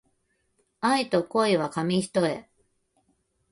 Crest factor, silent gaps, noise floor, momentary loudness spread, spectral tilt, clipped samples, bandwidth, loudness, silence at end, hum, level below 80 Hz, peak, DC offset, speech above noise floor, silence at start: 18 dB; none; -72 dBFS; 6 LU; -5 dB/octave; under 0.1%; 11.5 kHz; -25 LUFS; 1.1 s; none; -68 dBFS; -10 dBFS; under 0.1%; 48 dB; 0.8 s